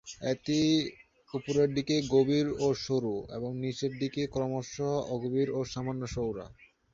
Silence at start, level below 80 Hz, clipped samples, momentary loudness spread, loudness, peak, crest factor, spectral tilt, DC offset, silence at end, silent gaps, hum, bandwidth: 0.05 s; -58 dBFS; under 0.1%; 10 LU; -31 LUFS; -14 dBFS; 18 dB; -6 dB/octave; under 0.1%; 0.3 s; none; none; 7.6 kHz